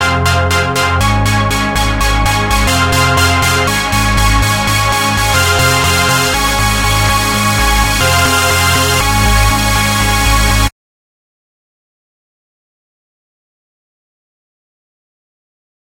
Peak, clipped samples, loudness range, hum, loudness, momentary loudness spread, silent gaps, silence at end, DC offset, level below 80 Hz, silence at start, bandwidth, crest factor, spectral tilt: 0 dBFS; under 0.1%; 5 LU; none; -11 LUFS; 3 LU; none; 5.3 s; under 0.1%; -20 dBFS; 0 s; 17 kHz; 12 dB; -3.5 dB/octave